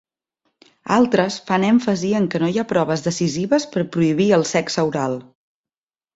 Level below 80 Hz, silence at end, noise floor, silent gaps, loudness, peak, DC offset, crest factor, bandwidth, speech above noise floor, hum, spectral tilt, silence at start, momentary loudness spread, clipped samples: -58 dBFS; 0.95 s; under -90 dBFS; none; -19 LUFS; -2 dBFS; under 0.1%; 18 dB; 8 kHz; over 72 dB; none; -5.5 dB/octave; 0.85 s; 6 LU; under 0.1%